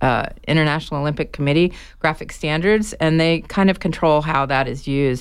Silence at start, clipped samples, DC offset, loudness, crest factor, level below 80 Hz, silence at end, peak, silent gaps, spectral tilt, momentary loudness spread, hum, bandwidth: 0 s; under 0.1%; under 0.1%; -19 LUFS; 14 dB; -38 dBFS; 0 s; -4 dBFS; none; -6.5 dB/octave; 5 LU; none; 13 kHz